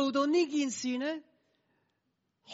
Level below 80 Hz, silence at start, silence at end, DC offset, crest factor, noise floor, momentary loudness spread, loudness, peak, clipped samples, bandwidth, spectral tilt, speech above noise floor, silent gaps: -86 dBFS; 0 s; 0 s; under 0.1%; 16 dB; -80 dBFS; 9 LU; -31 LUFS; -18 dBFS; under 0.1%; 8 kHz; -2 dB/octave; 50 dB; none